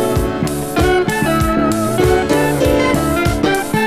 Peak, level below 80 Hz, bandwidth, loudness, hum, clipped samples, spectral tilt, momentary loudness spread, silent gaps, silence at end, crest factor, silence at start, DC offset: -2 dBFS; -26 dBFS; 16 kHz; -15 LUFS; none; under 0.1%; -5.5 dB/octave; 4 LU; none; 0 s; 12 dB; 0 s; under 0.1%